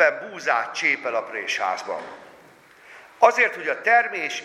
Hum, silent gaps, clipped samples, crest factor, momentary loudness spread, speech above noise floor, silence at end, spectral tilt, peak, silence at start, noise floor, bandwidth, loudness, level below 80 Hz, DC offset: none; none; under 0.1%; 22 dB; 11 LU; 28 dB; 0 s; -1.5 dB/octave; 0 dBFS; 0 s; -51 dBFS; 13 kHz; -22 LUFS; -78 dBFS; under 0.1%